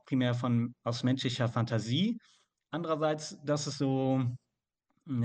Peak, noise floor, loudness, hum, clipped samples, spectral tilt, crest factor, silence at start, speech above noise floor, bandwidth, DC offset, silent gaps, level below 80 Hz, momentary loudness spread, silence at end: -14 dBFS; -82 dBFS; -32 LUFS; none; under 0.1%; -6 dB/octave; 18 dB; 0.1 s; 51 dB; 9.2 kHz; under 0.1%; none; -72 dBFS; 8 LU; 0 s